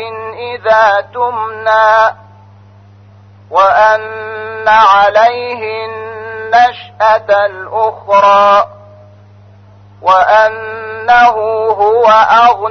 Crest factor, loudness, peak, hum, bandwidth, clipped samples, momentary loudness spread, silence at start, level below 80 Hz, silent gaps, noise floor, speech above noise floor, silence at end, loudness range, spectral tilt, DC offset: 10 dB; -9 LUFS; 0 dBFS; none; 6.6 kHz; under 0.1%; 16 LU; 0 s; -50 dBFS; none; -39 dBFS; 30 dB; 0 s; 2 LU; -3.5 dB/octave; under 0.1%